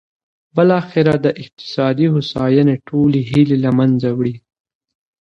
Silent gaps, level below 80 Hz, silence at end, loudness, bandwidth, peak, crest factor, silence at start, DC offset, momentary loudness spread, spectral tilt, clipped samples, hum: none; -50 dBFS; 0.8 s; -15 LUFS; 7.2 kHz; 0 dBFS; 16 dB; 0.55 s; under 0.1%; 9 LU; -8.5 dB/octave; under 0.1%; none